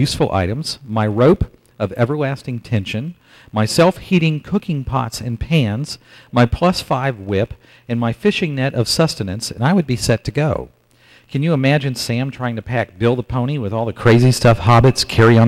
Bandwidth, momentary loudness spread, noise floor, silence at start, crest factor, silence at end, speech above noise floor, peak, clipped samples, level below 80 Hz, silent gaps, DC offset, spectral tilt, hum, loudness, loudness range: 14.5 kHz; 12 LU; -50 dBFS; 0 s; 12 dB; 0 s; 34 dB; -4 dBFS; under 0.1%; -38 dBFS; none; under 0.1%; -6 dB/octave; none; -17 LUFS; 3 LU